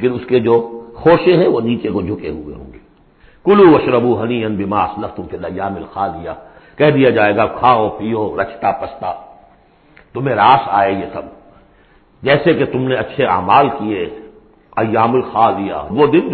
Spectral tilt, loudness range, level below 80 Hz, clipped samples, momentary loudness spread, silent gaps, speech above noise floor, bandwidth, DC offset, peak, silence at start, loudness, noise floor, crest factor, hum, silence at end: -11 dB/octave; 3 LU; -44 dBFS; under 0.1%; 15 LU; none; 35 dB; 4.5 kHz; under 0.1%; 0 dBFS; 0 s; -14 LUFS; -49 dBFS; 16 dB; none; 0 s